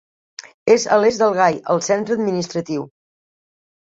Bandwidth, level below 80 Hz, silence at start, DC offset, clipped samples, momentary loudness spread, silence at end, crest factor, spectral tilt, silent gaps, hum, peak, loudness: 7.8 kHz; -62 dBFS; 0.4 s; under 0.1%; under 0.1%; 15 LU; 1.1 s; 18 dB; -4.5 dB/octave; 0.54-0.66 s; none; -2 dBFS; -18 LUFS